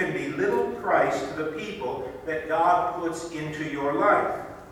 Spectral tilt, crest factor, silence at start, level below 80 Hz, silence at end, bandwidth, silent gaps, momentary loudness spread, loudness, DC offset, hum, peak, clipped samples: -5.5 dB/octave; 18 dB; 0 s; -56 dBFS; 0 s; 17 kHz; none; 11 LU; -26 LUFS; under 0.1%; none; -8 dBFS; under 0.1%